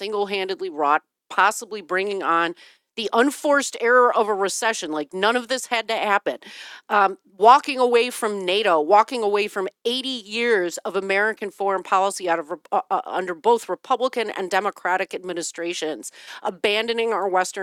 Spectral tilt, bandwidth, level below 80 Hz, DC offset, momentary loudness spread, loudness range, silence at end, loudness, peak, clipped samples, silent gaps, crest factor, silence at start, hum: -2.5 dB/octave; 16.5 kHz; -76 dBFS; under 0.1%; 11 LU; 5 LU; 0 s; -21 LUFS; -2 dBFS; under 0.1%; none; 20 dB; 0 s; none